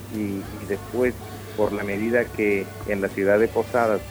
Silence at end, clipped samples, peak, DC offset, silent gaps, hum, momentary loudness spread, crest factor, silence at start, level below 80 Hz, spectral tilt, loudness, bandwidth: 0 s; under 0.1%; -6 dBFS; under 0.1%; none; none; 10 LU; 18 dB; 0 s; -46 dBFS; -6.5 dB/octave; -24 LUFS; over 20 kHz